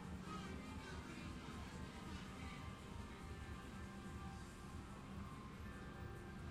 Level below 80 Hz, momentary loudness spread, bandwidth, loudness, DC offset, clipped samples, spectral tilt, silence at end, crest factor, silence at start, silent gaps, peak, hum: -58 dBFS; 3 LU; 15.5 kHz; -53 LUFS; under 0.1%; under 0.1%; -5.5 dB/octave; 0 s; 14 dB; 0 s; none; -38 dBFS; none